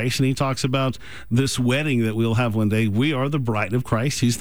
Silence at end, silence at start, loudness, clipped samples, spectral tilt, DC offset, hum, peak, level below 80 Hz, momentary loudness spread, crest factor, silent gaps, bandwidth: 0 s; 0 s; -22 LUFS; under 0.1%; -5.5 dB/octave; 1%; none; -8 dBFS; -48 dBFS; 3 LU; 12 dB; none; over 20 kHz